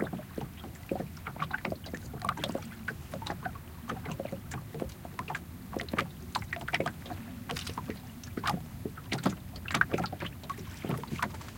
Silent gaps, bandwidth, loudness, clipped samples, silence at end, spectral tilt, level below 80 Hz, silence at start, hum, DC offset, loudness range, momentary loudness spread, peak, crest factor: none; 17 kHz; -37 LUFS; under 0.1%; 0 s; -5 dB/octave; -54 dBFS; 0 s; none; under 0.1%; 4 LU; 9 LU; -8 dBFS; 30 dB